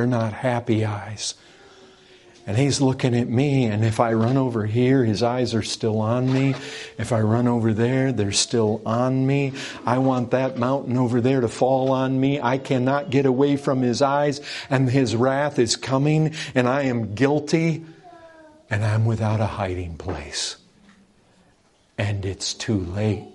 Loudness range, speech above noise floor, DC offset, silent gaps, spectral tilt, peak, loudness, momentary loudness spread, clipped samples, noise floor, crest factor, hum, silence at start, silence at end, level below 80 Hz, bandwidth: 6 LU; 38 dB; under 0.1%; none; -6 dB/octave; -2 dBFS; -22 LUFS; 8 LU; under 0.1%; -59 dBFS; 20 dB; none; 0 s; 0.05 s; -54 dBFS; 11.5 kHz